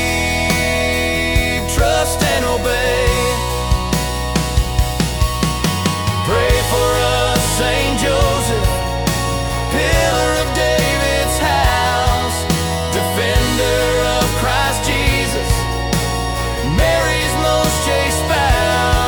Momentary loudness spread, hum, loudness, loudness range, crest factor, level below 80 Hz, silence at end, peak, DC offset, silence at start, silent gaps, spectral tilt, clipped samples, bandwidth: 4 LU; none; -16 LUFS; 2 LU; 14 dB; -22 dBFS; 0 s; -2 dBFS; under 0.1%; 0 s; none; -4 dB/octave; under 0.1%; 18 kHz